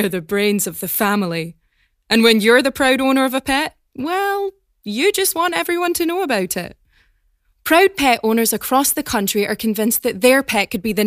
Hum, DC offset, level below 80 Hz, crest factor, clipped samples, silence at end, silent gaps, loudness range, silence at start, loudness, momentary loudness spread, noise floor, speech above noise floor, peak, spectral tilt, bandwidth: none; under 0.1%; -50 dBFS; 18 dB; under 0.1%; 0 s; none; 3 LU; 0 s; -17 LUFS; 11 LU; -63 dBFS; 46 dB; 0 dBFS; -3 dB/octave; 15.5 kHz